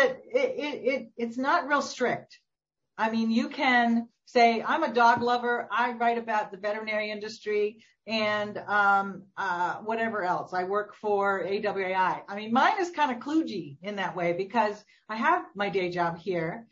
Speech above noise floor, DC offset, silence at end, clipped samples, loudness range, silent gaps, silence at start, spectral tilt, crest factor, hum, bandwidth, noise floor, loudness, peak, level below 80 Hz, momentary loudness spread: 59 dB; under 0.1%; 0.1 s; under 0.1%; 4 LU; none; 0 s; -5 dB/octave; 18 dB; none; 7.8 kHz; -86 dBFS; -27 LUFS; -10 dBFS; -74 dBFS; 9 LU